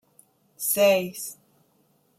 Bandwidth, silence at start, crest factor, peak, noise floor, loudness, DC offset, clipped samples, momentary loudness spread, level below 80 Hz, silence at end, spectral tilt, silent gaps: 16 kHz; 0.6 s; 18 dB; -8 dBFS; -65 dBFS; -23 LUFS; under 0.1%; under 0.1%; 16 LU; -76 dBFS; 0.85 s; -2.5 dB/octave; none